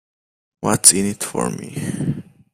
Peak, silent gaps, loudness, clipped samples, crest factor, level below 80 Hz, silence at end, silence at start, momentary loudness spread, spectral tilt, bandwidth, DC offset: 0 dBFS; none; -17 LUFS; under 0.1%; 20 dB; -54 dBFS; 0.3 s; 0.6 s; 16 LU; -3 dB/octave; 15.5 kHz; under 0.1%